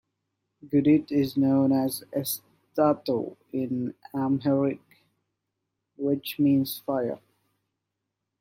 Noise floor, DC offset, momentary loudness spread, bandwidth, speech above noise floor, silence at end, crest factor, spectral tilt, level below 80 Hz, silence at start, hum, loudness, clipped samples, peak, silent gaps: -83 dBFS; under 0.1%; 11 LU; 16.5 kHz; 58 dB; 1.25 s; 18 dB; -6.5 dB/octave; -68 dBFS; 0.65 s; none; -26 LUFS; under 0.1%; -10 dBFS; none